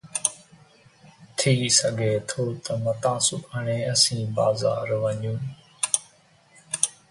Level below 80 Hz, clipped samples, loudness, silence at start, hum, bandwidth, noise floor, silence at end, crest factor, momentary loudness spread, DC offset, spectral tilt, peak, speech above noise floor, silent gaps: -62 dBFS; under 0.1%; -24 LUFS; 0.05 s; none; 11.5 kHz; -57 dBFS; 0.2 s; 26 dB; 10 LU; under 0.1%; -3 dB/octave; 0 dBFS; 33 dB; none